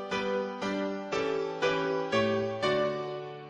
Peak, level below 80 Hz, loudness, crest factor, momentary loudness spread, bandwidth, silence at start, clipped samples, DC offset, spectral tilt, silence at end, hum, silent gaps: -16 dBFS; -64 dBFS; -30 LUFS; 14 dB; 5 LU; 10 kHz; 0 s; under 0.1%; under 0.1%; -5 dB/octave; 0 s; none; none